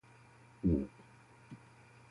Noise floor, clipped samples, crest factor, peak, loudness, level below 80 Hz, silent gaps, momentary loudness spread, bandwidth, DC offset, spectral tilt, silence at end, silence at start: -61 dBFS; under 0.1%; 20 dB; -20 dBFS; -36 LUFS; -50 dBFS; none; 26 LU; 11.5 kHz; under 0.1%; -9.5 dB/octave; 0.55 s; 0.65 s